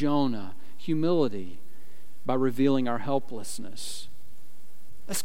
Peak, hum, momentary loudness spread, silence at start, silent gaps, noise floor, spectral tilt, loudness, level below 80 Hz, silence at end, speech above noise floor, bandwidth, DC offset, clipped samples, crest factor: -12 dBFS; none; 17 LU; 0 s; none; -59 dBFS; -5.5 dB/octave; -29 LUFS; -66 dBFS; 0 s; 32 dB; 16.5 kHz; 5%; under 0.1%; 18 dB